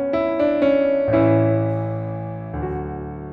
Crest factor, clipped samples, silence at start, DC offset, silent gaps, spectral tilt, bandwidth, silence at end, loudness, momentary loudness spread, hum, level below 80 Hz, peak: 14 dB; under 0.1%; 0 s; under 0.1%; none; -10.5 dB/octave; 5 kHz; 0 s; -20 LUFS; 13 LU; none; -42 dBFS; -6 dBFS